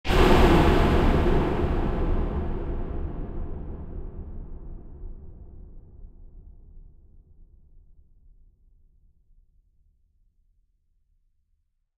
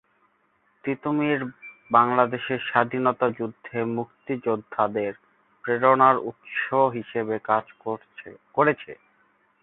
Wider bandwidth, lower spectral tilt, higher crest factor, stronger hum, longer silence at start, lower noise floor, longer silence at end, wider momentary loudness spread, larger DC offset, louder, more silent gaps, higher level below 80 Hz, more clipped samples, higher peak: first, 14 kHz vs 4.1 kHz; second, -7 dB/octave vs -10.5 dB/octave; about the same, 22 dB vs 22 dB; neither; second, 0.05 s vs 0.85 s; first, -71 dBFS vs -67 dBFS; first, 4.55 s vs 0.7 s; first, 26 LU vs 14 LU; neither; about the same, -24 LUFS vs -24 LUFS; neither; first, -30 dBFS vs -68 dBFS; neither; about the same, -4 dBFS vs -4 dBFS